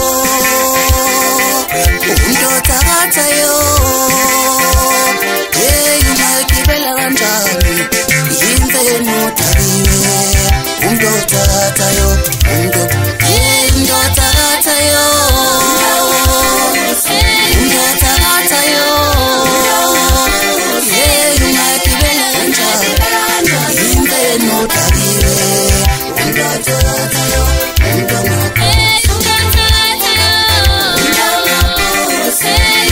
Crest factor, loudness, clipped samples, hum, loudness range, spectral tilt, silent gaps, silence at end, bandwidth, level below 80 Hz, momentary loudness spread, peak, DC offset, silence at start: 10 dB; -9 LUFS; under 0.1%; none; 2 LU; -2.5 dB/octave; none; 0 s; 16.5 kHz; -18 dBFS; 4 LU; 0 dBFS; under 0.1%; 0 s